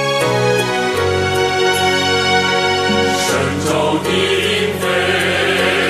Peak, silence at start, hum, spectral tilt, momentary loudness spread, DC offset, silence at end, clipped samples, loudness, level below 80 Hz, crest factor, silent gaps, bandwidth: -2 dBFS; 0 s; none; -3.5 dB/octave; 3 LU; under 0.1%; 0 s; under 0.1%; -14 LUFS; -48 dBFS; 12 dB; none; 14 kHz